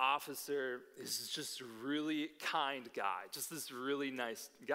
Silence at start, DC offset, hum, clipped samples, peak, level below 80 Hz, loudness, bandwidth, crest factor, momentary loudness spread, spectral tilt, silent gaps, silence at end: 0 s; under 0.1%; none; under 0.1%; -18 dBFS; under -90 dBFS; -40 LUFS; 16 kHz; 22 dB; 6 LU; -2 dB/octave; none; 0 s